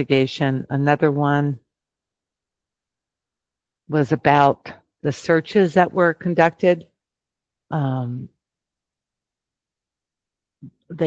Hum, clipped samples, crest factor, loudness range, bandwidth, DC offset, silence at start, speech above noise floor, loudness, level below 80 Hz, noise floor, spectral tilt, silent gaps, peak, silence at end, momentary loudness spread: none; under 0.1%; 22 dB; 13 LU; 7.8 kHz; under 0.1%; 0 s; 70 dB; -19 LUFS; -62 dBFS; -88 dBFS; -7.5 dB/octave; none; 0 dBFS; 0 s; 12 LU